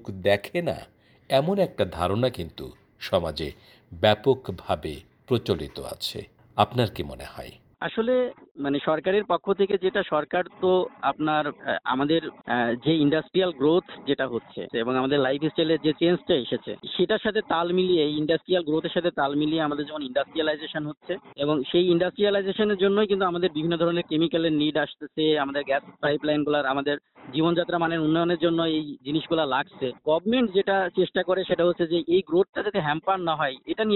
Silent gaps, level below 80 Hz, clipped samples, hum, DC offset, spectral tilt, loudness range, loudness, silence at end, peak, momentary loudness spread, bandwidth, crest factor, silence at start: 8.51-8.55 s, 32.49-32.53 s; -56 dBFS; under 0.1%; none; under 0.1%; -6.5 dB/octave; 4 LU; -25 LUFS; 0 s; -4 dBFS; 9 LU; 16 kHz; 20 dB; 0.05 s